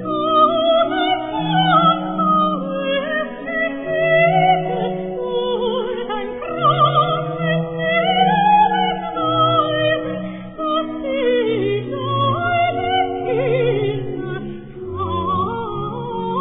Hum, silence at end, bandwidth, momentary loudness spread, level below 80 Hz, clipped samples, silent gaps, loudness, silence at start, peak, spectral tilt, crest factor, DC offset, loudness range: none; 0 s; 4 kHz; 11 LU; -48 dBFS; under 0.1%; none; -18 LUFS; 0 s; -2 dBFS; -9.5 dB/octave; 16 dB; under 0.1%; 4 LU